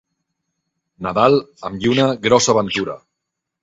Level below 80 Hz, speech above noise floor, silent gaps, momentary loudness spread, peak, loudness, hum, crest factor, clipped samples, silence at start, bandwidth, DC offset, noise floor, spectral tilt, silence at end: -52 dBFS; 63 dB; none; 14 LU; 0 dBFS; -16 LUFS; none; 20 dB; under 0.1%; 1 s; 8 kHz; under 0.1%; -80 dBFS; -4 dB/octave; 0.65 s